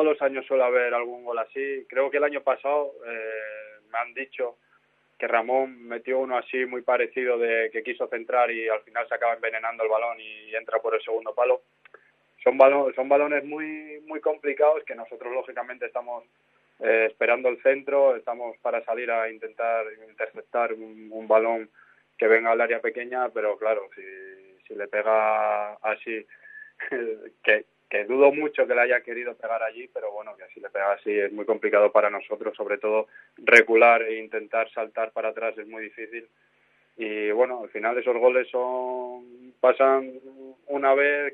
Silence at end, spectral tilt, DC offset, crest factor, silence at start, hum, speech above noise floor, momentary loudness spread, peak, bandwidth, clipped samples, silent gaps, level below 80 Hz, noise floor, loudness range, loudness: 0 s; -4.5 dB/octave; under 0.1%; 24 dB; 0 s; none; 40 dB; 15 LU; 0 dBFS; 10.5 kHz; under 0.1%; none; -86 dBFS; -65 dBFS; 7 LU; -24 LUFS